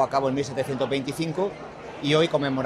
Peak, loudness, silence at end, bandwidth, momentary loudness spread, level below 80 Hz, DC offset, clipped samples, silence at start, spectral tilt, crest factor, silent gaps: -8 dBFS; -25 LUFS; 0 s; 13.5 kHz; 9 LU; -58 dBFS; under 0.1%; under 0.1%; 0 s; -5.5 dB/octave; 18 dB; none